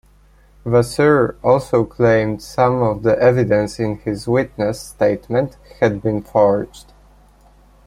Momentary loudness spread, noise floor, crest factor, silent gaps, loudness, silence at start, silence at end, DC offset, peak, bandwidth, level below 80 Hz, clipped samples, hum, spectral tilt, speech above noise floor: 8 LU; -50 dBFS; 16 dB; none; -17 LUFS; 0.65 s; 1.05 s; under 0.1%; -2 dBFS; 14.5 kHz; -44 dBFS; under 0.1%; 50 Hz at -40 dBFS; -7 dB/octave; 33 dB